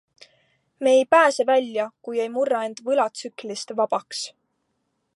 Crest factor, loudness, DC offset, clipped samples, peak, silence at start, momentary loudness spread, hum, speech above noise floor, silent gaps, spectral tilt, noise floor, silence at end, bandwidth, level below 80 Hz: 20 dB; -22 LUFS; under 0.1%; under 0.1%; -2 dBFS; 0.8 s; 15 LU; none; 52 dB; none; -2.5 dB/octave; -74 dBFS; 0.9 s; 11.5 kHz; -82 dBFS